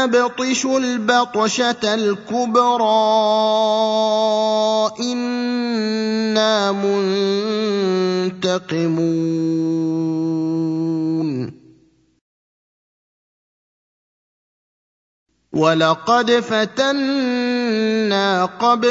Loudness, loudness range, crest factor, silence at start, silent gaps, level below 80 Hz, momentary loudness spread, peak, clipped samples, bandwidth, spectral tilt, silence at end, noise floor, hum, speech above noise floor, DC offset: -18 LUFS; 8 LU; 18 dB; 0 s; 12.21-15.26 s; -66 dBFS; 5 LU; -2 dBFS; under 0.1%; 7.8 kHz; -4.5 dB/octave; 0 s; -56 dBFS; none; 38 dB; under 0.1%